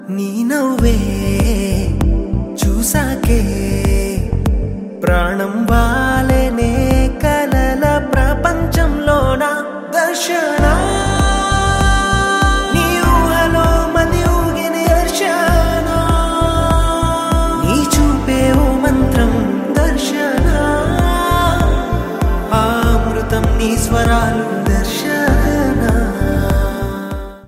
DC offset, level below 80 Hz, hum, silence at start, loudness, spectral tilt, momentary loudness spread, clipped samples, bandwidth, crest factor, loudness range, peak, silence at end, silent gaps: under 0.1%; -18 dBFS; none; 0 s; -15 LUFS; -5.5 dB/octave; 4 LU; under 0.1%; 16 kHz; 14 dB; 3 LU; 0 dBFS; 0.05 s; none